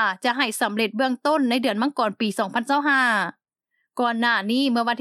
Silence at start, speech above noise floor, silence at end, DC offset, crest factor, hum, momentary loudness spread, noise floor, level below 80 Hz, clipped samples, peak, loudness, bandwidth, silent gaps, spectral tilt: 0 s; 53 dB; 0 s; under 0.1%; 18 dB; none; 6 LU; -75 dBFS; -88 dBFS; under 0.1%; -4 dBFS; -22 LUFS; 13.5 kHz; none; -3.5 dB/octave